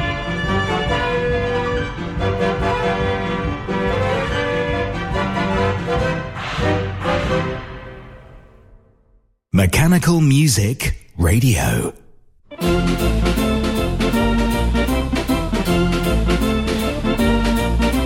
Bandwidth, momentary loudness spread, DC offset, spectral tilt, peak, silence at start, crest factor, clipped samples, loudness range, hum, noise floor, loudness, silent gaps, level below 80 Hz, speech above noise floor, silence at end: 16.5 kHz; 8 LU; under 0.1%; -5.5 dB/octave; -4 dBFS; 0 s; 14 dB; under 0.1%; 5 LU; none; -57 dBFS; -19 LUFS; none; -26 dBFS; 42 dB; 0 s